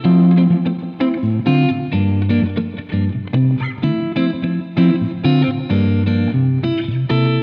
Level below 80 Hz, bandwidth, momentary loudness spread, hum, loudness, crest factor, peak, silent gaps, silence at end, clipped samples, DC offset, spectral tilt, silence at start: -48 dBFS; 5.2 kHz; 6 LU; none; -17 LUFS; 12 dB; -4 dBFS; none; 0 s; under 0.1%; under 0.1%; -10.5 dB/octave; 0 s